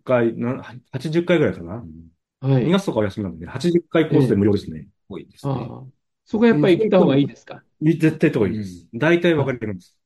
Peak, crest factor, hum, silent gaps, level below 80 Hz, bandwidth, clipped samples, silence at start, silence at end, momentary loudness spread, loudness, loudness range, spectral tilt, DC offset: -4 dBFS; 16 dB; none; none; -54 dBFS; 12 kHz; under 0.1%; 0.05 s; 0.3 s; 18 LU; -20 LUFS; 4 LU; -7.5 dB/octave; under 0.1%